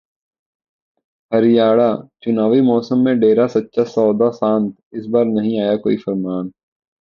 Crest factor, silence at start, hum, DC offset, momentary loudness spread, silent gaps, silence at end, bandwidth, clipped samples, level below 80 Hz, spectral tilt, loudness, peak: 16 dB; 1.3 s; none; under 0.1%; 10 LU; 4.83-4.91 s; 0.5 s; 6.8 kHz; under 0.1%; -60 dBFS; -8.5 dB/octave; -16 LUFS; -2 dBFS